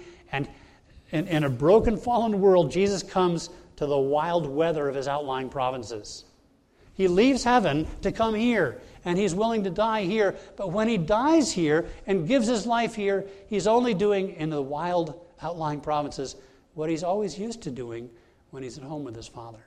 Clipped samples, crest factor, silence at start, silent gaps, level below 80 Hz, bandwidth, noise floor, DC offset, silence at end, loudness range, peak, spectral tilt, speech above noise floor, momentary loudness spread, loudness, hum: under 0.1%; 18 dB; 0 s; none; -48 dBFS; 12.5 kHz; -61 dBFS; under 0.1%; 0.1 s; 7 LU; -8 dBFS; -5.5 dB/octave; 36 dB; 16 LU; -25 LUFS; none